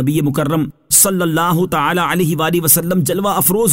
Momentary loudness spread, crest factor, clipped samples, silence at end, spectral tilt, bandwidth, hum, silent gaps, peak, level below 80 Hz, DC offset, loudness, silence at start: 6 LU; 14 dB; under 0.1%; 0 s; -4 dB/octave; 16.5 kHz; none; none; 0 dBFS; -46 dBFS; 0.5%; -14 LUFS; 0 s